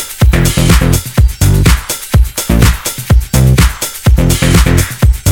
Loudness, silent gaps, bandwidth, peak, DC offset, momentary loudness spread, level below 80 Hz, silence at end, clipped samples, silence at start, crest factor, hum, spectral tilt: -10 LUFS; none; 19 kHz; 0 dBFS; under 0.1%; 4 LU; -12 dBFS; 0 s; 0.4%; 0 s; 8 dB; none; -5 dB/octave